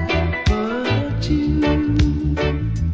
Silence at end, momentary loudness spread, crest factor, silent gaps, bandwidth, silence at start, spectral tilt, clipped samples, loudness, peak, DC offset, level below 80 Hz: 0 s; 3 LU; 12 dB; none; 7.6 kHz; 0 s; -7 dB/octave; under 0.1%; -20 LUFS; -6 dBFS; under 0.1%; -24 dBFS